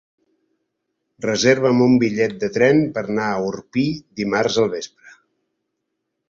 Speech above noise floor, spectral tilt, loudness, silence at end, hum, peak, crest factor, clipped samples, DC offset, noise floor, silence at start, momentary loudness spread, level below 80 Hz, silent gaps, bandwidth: 59 dB; -5.5 dB/octave; -19 LUFS; 1.4 s; none; -2 dBFS; 18 dB; under 0.1%; under 0.1%; -77 dBFS; 1.2 s; 9 LU; -58 dBFS; none; 7.6 kHz